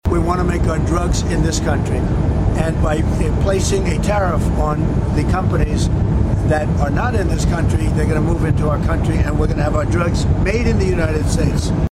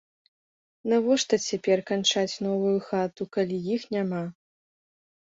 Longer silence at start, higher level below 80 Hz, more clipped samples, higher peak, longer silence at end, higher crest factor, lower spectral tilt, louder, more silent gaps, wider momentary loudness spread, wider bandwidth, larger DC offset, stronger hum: second, 0.05 s vs 0.85 s; first, -22 dBFS vs -70 dBFS; neither; first, -4 dBFS vs -10 dBFS; second, 0.05 s vs 0.9 s; second, 12 dB vs 18 dB; first, -6.5 dB/octave vs -4.5 dB/octave; first, -17 LUFS vs -26 LUFS; neither; second, 1 LU vs 7 LU; first, 13.5 kHz vs 7.8 kHz; neither; neither